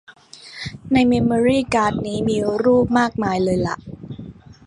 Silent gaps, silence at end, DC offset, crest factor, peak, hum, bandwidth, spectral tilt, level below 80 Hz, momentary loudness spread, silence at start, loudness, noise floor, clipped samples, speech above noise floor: none; 0.15 s; under 0.1%; 16 dB; -2 dBFS; none; 11 kHz; -6.5 dB/octave; -44 dBFS; 19 LU; 0.1 s; -18 LUFS; -38 dBFS; under 0.1%; 20 dB